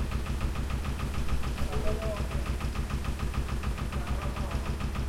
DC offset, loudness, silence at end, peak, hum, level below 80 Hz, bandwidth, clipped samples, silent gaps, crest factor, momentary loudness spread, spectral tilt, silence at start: under 0.1%; -34 LUFS; 0 s; -14 dBFS; none; -34 dBFS; 16 kHz; under 0.1%; none; 16 dB; 1 LU; -6 dB/octave; 0 s